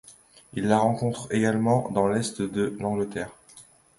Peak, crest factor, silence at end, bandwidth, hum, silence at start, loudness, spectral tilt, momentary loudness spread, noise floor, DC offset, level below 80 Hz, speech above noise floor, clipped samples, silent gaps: -8 dBFS; 18 dB; 0.35 s; 11.5 kHz; none; 0.1 s; -25 LUFS; -6 dB/octave; 9 LU; -53 dBFS; under 0.1%; -58 dBFS; 28 dB; under 0.1%; none